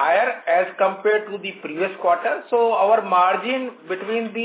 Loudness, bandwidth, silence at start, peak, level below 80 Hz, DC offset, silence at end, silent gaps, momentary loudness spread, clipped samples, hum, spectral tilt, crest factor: -21 LUFS; 4 kHz; 0 s; -6 dBFS; -84 dBFS; under 0.1%; 0 s; none; 12 LU; under 0.1%; none; -8 dB/octave; 16 dB